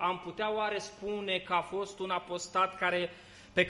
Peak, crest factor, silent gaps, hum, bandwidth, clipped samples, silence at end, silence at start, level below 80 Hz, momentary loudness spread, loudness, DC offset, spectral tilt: -14 dBFS; 20 dB; none; none; 11.5 kHz; under 0.1%; 0 s; 0 s; -66 dBFS; 8 LU; -33 LUFS; under 0.1%; -3.5 dB/octave